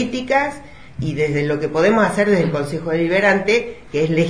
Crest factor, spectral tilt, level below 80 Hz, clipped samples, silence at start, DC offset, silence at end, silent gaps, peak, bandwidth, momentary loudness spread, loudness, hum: 14 dB; -6 dB/octave; -48 dBFS; under 0.1%; 0 s; 0.7%; 0 s; none; -4 dBFS; 10.5 kHz; 10 LU; -18 LUFS; none